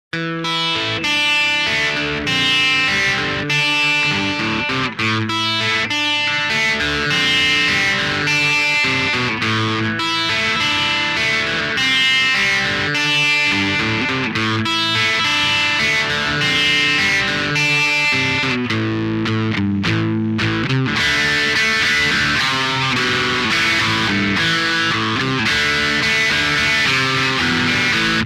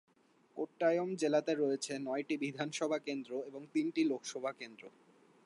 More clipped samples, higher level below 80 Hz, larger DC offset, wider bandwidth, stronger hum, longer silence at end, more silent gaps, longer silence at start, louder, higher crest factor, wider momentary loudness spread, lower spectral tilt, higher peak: neither; first, -44 dBFS vs under -90 dBFS; neither; first, 15.5 kHz vs 11.5 kHz; neither; second, 0 s vs 0.55 s; neither; second, 0.15 s vs 0.55 s; first, -15 LUFS vs -36 LUFS; second, 12 dB vs 18 dB; second, 5 LU vs 11 LU; second, -3 dB/octave vs -4.5 dB/octave; first, -6 dBFS vs -20 dBFS